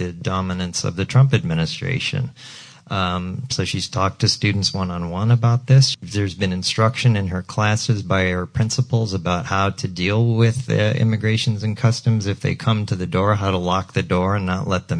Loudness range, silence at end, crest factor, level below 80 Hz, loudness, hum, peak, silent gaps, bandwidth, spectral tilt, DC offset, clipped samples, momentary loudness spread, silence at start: 3 LU; 0 s; 16 dB; -48 dBFS; -20 LUFS; none; -4 dBFS; none; 10.5 kHz; -5.5 dB/octave; under 0.1%; under 0.1%; 7 LU; 0 s